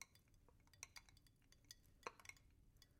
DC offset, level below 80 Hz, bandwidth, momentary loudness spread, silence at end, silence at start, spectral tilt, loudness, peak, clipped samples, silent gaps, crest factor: under 0.1%; -76 dBFS; 16.5 kHz; 8 LU; 0 s; 0 s; -1.5 dB/octave; -61 LUFS; -32 dBFS; under 0.1%; none; 34 dB